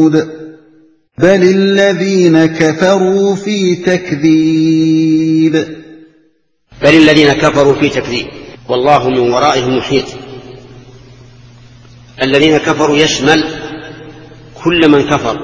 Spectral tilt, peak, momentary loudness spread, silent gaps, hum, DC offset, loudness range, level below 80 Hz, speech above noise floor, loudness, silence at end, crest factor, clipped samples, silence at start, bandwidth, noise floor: -5.5 dB/octave; 0 dBFS; 16 LU; none; none; under 0.1%; 4 LU; -42 dBFS; 46 dB; -10 LUFS; 0 s; 12 dB; 0.8%; 0 s; 8 kHz; -56 dBFS